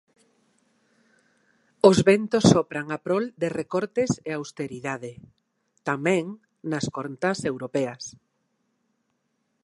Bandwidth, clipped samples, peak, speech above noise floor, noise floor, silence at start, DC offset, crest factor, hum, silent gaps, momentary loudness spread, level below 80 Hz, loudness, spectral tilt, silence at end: 11.5 kHz; under 0.1%; -2 dBFS; 50 dB; -74 dBFS; 1.85 s; under 0.1%; 24 dB; none; none; 16 LU; -60 dBFS; -24 LUFS; -5.5 dB/octave; 1.55 s